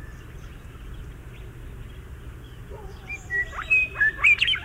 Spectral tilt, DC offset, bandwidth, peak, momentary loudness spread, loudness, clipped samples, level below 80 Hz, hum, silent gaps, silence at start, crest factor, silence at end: -2.5 dB/octave; under 0.1%; 16 kHz; -8 dBFS; 25 LU; -20 LUFS; under 0.1%; -42 dBFS; none; none; 0 s; 20 dB; 0 s